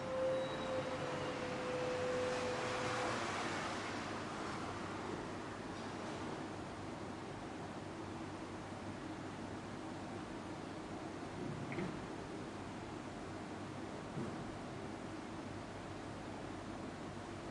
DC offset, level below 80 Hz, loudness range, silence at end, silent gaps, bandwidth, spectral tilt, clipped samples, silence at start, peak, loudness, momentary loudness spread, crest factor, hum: under 0.1%; -64 dBFS; 7 LU; 0 s; none; 11.5 kHz; -5 dB/octave; under 0.1%; 0 s; -26 dBFS; -44 LUFS; 9 LU; 16 dB; none